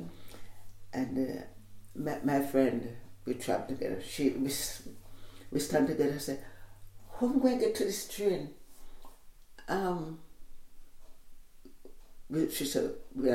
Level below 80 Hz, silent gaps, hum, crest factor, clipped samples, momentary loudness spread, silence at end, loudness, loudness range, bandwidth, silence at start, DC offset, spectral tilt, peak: -54 dBFS; none; none; 20 dB; under 0.1%; 21 LU; 0 s; -33 LUFS; 8 LU; 16.5 kHz; 0 s; under 0.1%; -5 dB/octave; -14 dBFS